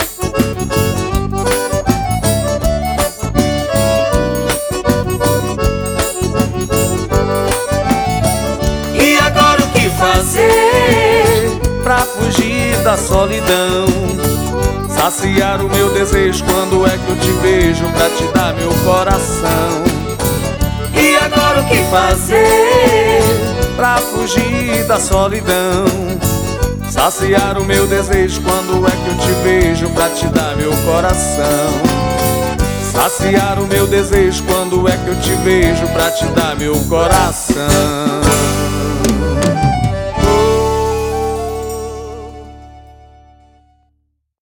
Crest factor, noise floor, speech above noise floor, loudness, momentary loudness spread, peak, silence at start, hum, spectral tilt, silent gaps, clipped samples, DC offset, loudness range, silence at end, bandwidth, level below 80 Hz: 12 dB; -64 dBFS; 52 dB; -13 LUFS; 7 LU; 0 dBFS; 0 s; none; -4.5 dB/octave; none; under 0.1%; under 0.1%; 4 LU; 1.5 s; over 20 kHz; -24 dBFS